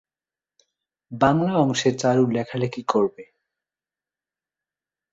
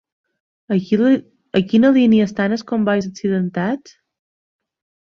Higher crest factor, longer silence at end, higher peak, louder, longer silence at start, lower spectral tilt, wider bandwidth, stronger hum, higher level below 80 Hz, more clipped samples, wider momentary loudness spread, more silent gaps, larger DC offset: first, 22 dB vs 16 dB; first, 1.9 s vs 1.3 s; about the same, -2 dBFS vs -4 dBFS; second, -22 LUFS vs -17 LUFS; first, 1.1 s vs 0.7 s; about the same, -6 dB/octave vs -7 dB/octave; first, 8 kHz vs 6.8 kHz; neither; about the same, -58 dBFS vs -58 dBFS; neither; about the same, 7 LU vs 9 LU; neither; neither